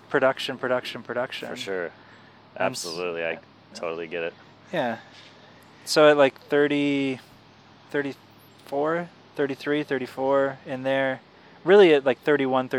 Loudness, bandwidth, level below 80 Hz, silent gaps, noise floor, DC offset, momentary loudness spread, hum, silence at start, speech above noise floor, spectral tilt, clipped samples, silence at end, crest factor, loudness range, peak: -24 LUFS; 14.5 kHz; -76 dBFS; none; -52 dBFS; under 0.1%; 17 LU; none; 0.1 s; 29 dB; -4.5 dB/octave; under 0.1%; 0 s; 20 dB; 9 LU; -4 dBFS